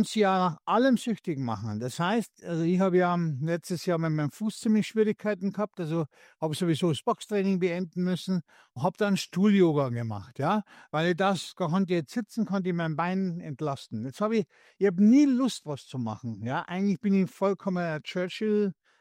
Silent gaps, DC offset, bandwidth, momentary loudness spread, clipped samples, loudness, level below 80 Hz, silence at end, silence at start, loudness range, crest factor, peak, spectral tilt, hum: none; under 0.1%; 15.5 kHz; 10 LU; under 0.1%; -28 LUFS; -72 dBFS; 0.3 s; 0 s; 3 LU; 16 dB; -12 dBFS; -6.5 dB/octave; none